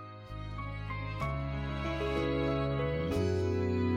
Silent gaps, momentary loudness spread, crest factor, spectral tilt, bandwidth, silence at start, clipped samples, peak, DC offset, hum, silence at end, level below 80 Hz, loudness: none; 9 LU; 12 dB; -7.5 dB/octave; 11.5 kHz; 0 s; under 0.1%; -20 dBFS; under 0.1%; none; 0 s; -44 dBFS; -34 LUFS